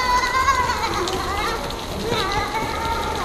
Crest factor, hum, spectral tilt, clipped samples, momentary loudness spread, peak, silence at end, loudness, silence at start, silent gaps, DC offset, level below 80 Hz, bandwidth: 16 dB; none; -3.5 dB/octave; under 0.1%; 7 LU; -6 dBFS; 0 s; -22 LUFS; 0 s; none; under 0.1%; -34 dBFS; 15.5 kHz